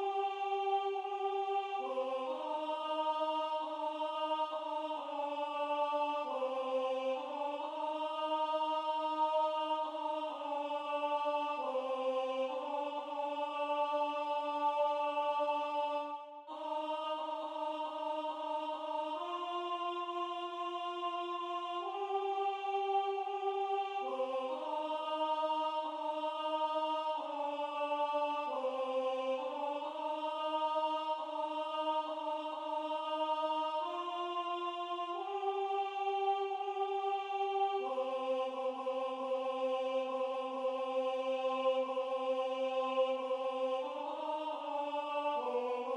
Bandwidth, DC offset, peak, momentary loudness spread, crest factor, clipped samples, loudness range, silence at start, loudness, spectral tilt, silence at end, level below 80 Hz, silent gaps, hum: 10.5 kHz; under 0.1%; -22 dBFS; 5 LU; 14 dB; under 0.1%; 3 LU; 0 s; -37 LUFS; -2 dB/octave; 0 s; under -90 dBFS; none; none